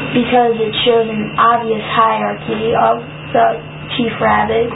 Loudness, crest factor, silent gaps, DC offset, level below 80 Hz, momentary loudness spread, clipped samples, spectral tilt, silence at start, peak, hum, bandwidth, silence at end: -14 LUFS; 14 dB; none; under 0.1%; -42 dBFS; 7 LU; under 0.1%; -11 dB/octave; 0 s; 0 dBFS; none; 4 kHz; 0 s